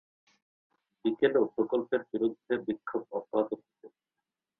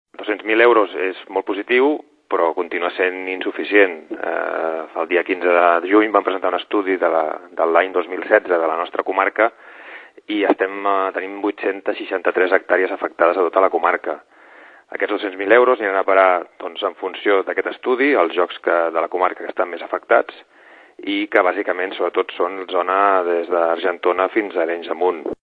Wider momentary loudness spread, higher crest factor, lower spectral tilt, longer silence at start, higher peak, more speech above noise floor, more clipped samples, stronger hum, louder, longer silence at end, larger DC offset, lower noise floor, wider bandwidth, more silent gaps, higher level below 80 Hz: about the same, 9 LU vs 10 LU; about the same, 20 dB vs 18 dB; first, -8.5 dB/octave vs -6 dB/octave; first, 1.05 s vs 0.2 s; second, -12 dBFS vs 0 dBFS; first, 58 dB vs 27 dB; neither; neither; second, -31 LUFS vs -18 LUFS; first, 0.7 s vs 0.1 s; neither; first, -89 dBFS vs -45 dBFS; second, 4.2 kHz vs 4.7 kHz; neither; second, -76 dBFS vs -68 dBFS